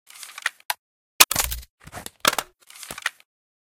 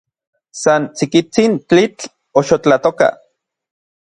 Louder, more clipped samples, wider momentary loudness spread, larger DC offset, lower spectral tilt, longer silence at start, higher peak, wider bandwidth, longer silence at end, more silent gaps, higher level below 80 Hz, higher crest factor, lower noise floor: second, -22 LUFS vs -14 LUFS; neither; first, 23 LU vs 6 LU; neither; second, 0 dB/octave vs -5 dB/octave; second, 0.2 s vs 0.55 s; about the same, 0 dBFS vs 0 dBFS; first, 17 kHz vs 10.5 kHz; second, 0.65 s vs 0.9 s; first, 0.65-0.69 s, 0.79-1.19 s, 1.70-1.78 s vs none; first, -46 dBFS vs -56 dBFS; first, 26 dB vs 16 dB; second, -43 dBFS vs -61 dBFS